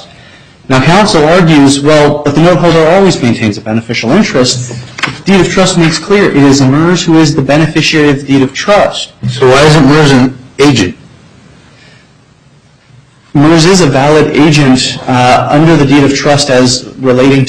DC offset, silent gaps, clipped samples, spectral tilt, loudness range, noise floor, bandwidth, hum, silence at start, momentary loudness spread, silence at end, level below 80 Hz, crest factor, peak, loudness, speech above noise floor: under 0.1%; none; 0.3%; -5 dB/octave; 4 LU; -42 dBFS; 11.5 kHz; none; 0 s; 7 LU; 0 s; -34 dBFS; 6 dB; 0 dBFS; -7 LUFS; 36 dB